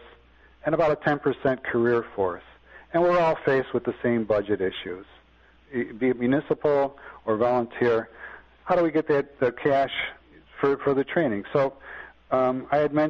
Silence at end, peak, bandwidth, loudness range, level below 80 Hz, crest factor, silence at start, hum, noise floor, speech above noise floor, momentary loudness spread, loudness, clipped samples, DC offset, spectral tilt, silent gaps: 0 s; -8 dBFS; 7.2 kHz; 2 LU; -56 dBFS; 18 dB; 0.65 s; none; -57 dBFS; 33 dB; 12 LU; -25 LUFS; under 0.1%; under 0.1%; -8 dB/octave; none